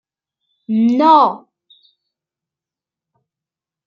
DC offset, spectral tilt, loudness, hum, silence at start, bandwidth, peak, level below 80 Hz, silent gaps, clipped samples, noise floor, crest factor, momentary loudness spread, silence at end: under 0.1%; -7.5 dB/octave; -13 LUFS; none; 0.7 s; 6.8 kHz; -2 dBFS; -74 dBFS; none; under 0.1%; -88 dBFS; 18 dB; 12 LU; 2.5 s